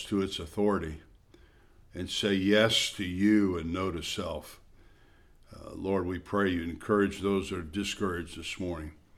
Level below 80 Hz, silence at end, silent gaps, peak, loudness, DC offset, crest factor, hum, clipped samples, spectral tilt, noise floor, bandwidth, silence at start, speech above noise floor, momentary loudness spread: -52 dBFS; 0.25 s; none; -10 dBFS; -30 LUFS; under 0.1%; 20 dB; none; under 0.1%; -4.5 dB/octave; -58 dBFS; 15 kHz; 0 s; 28 dB; 16 LU